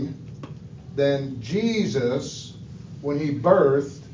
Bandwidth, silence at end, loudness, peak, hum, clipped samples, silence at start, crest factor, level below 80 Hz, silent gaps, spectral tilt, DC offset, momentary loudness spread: 7.6 kHz; 0 s; -23 LUFS; -2 dBFS; none; under 0.1%; 0 s; 22 dB; -54 dBFS; none; -6.5 dB/octave; under 0.1%; 21 LU